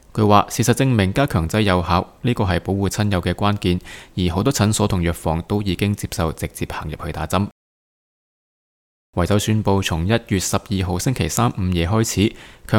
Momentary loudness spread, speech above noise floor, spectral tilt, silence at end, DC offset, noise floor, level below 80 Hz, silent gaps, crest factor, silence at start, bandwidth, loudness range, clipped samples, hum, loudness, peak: 8 LU; over 71 dB; -5.5 dB/octave; 0 s; under 0.1%; under -90 dBFS; -38 dBFS; 7.52-9.13 s; 20 dB; 0.15 s; 17.5 kHz; 6 LU; under 0.1%; none; -20 LUFS; 0 dBFS